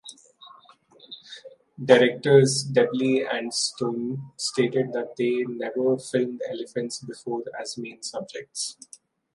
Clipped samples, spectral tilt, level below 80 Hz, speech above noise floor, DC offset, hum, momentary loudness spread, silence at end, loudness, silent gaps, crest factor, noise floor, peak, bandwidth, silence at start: under 0.1%; -4.5 dB/octave; -74 dBFS; 30 dB; under 0.1%; none; 18 LU; 0.65 s; -25 LUFS; none; 24 dB; -54 dBFS; -2 dBFS; 11.5 kHz; 0.05 s